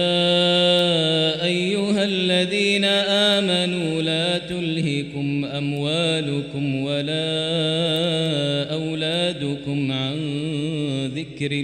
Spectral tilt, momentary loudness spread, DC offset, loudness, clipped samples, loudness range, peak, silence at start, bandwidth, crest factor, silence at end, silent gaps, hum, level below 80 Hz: -5 dB/octave; 8 LU; under 0.1%; -21 LUFS; under 0.1%; 5 LU; -6 dBFS; 0 s; 13.5 kHz; 14 dB; 0 s; none; none; -58 dBFS